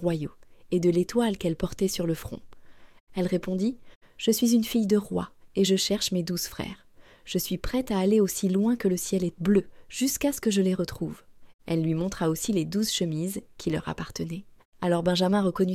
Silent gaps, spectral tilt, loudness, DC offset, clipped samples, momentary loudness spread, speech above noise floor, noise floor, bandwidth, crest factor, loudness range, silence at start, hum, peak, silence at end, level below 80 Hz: 3.00-3.07 s, 3.95-4.01 s, 11.54-11.59 s, 14.65-14.72 s; -5 dB/octave; -27 LUFS; under 0.1%; under 0.1%; 11 LU; 21 dB; -47 dBFS; 16.5 kHz; 16 dB; 3 LU; 0 s; none; -10 dBFS; 0 s; -50 dBFS